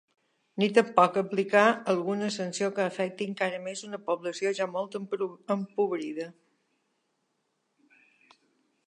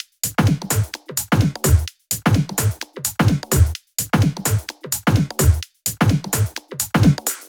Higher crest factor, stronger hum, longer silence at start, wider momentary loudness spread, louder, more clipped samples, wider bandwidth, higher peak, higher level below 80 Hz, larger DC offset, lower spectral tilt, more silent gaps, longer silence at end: first, 24 dB vs 16 dB; neither; first, 0.55 s vs 0.25 s; first, 14 LU vs 8 LU; second, -28 LUFS vs -19 LUFS; neither; second, 11 kHz vs 19 kHz; second, -6 dBFS vs -2 dBFS; second, -84 dBFS vs -30 dBFS; neither; about the same, -5 dB/octave vs -5 dB/octave; neither; first, 2.6 s vs 0.05 s